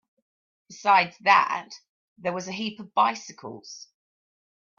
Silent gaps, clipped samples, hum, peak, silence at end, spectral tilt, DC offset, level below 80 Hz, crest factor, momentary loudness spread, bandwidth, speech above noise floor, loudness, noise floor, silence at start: 1.89-2.16 s; under 0.1%; none; -6 dBFS; 0.95 s; -3 dB/octave; under 0.1%; -78 dBFS; 22 dB; 21 LU; 7.4 kHz; over 65 dB; -24 LUFS; under -90 dBFS; 0.7 s